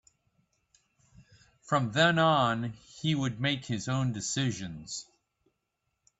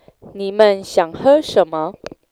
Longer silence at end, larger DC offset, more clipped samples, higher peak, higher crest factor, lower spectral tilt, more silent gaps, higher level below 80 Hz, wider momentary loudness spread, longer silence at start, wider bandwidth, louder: first, 1.15 s vs 0.4 s; neither; neither; second, -10 dBFS vs 0 dBFS; about the same, 20 dB vs 16 dB; about the same, -4.5 dB/octave vs -5 dB/octave; neither; second, -64 dBFS vs -54 dBFS; about the same, 15 LU vs 13 LU; first, 1.2 s vs 0.25 s; second, 8.4 kHz vs 13.5 kHz; second, -29 LUFS vs -16 LUFS